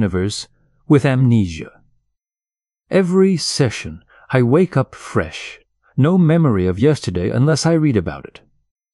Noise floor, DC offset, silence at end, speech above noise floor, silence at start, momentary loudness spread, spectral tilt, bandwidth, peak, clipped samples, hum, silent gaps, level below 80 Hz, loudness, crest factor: under -90 dBFS; under 0.1%; 0.7 s; over 74 dB; 0 s; 15 LU; -6.5 dB/octave; 12 kHz; -2 dBFS; under 0.1%; none; none; -46 dBFS; -16 LUFS; 16 dB